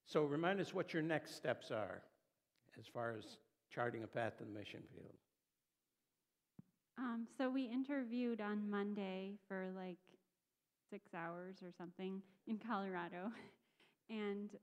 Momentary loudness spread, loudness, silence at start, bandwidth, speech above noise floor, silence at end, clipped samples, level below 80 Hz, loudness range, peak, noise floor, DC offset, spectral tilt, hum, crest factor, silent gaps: 17 LU; -45 LUFS; 0.05 s; 14.5 kHz; over 45 dB; 0.05 s; under 0.1%; under -90 dBFS; 7 LU; -24 dBFS; under -90 dBFS; under 0.1%; -6.5 dB/octave; none; 24 dB; none